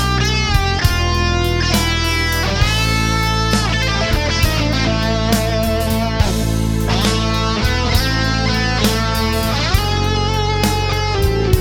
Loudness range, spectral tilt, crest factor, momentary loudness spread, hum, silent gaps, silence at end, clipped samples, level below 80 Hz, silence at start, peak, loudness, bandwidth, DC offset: 1 LU; -4.5 dB/octave; 16 dB; 2 LU; none; none; 0 s; under 0.1%; -22 dBFS; 0 s; 0 dBFS; -16 LUFS; over 20 kHz; under 0.1%